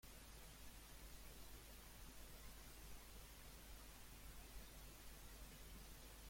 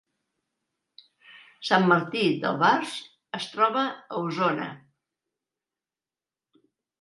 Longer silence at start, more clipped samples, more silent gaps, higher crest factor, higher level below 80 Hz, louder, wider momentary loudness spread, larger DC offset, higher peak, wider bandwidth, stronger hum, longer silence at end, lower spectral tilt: second, 0.05 s vs 1.3 s; neither; neither; second, 14 dB vs 22 dB; first, -62 dBFS vs -78 dBFS; second, -60 LUFS vs -25 LUFS; second, 1 LU vs 14 LU; neither; second, -44 dBFS vs -6 dBFS; first, 16.5 kHz vs 11.5 kHz; neither; second, 0 s vs 2.25 s; second, -3 dB/octave vs -5.5 dB/octave